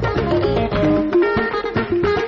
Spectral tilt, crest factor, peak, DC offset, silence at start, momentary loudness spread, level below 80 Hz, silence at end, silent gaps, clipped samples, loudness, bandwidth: -5.5 dB/octave; 12 dB; -6 dBFS; under 0.1%; 0 s; 4 LU; -34 dBFS; 0 s; none; under 0.1%; -18 LUFS; 6.8 kHz